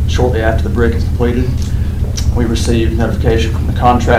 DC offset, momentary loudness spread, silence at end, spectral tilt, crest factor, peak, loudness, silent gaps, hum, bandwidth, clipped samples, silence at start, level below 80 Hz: under 0.1%; 4 LU; 0 s; -6.5 dB/octave; 12 dB; 0 dBFS; -14 LUFS; none; none; 15 kHz; under 0.1%; 0 s; -16 dBFS